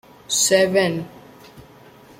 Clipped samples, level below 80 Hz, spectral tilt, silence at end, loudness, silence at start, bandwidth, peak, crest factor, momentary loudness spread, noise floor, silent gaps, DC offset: under 0.1%; -60 dBFS; -2.5 dB/octave; 0.6 s; -18 LUFS; 0.3 s; 16.5 kHz; -4 dBFS; 18 dB; 15 LU; -46 dBFS; none; under 0.1%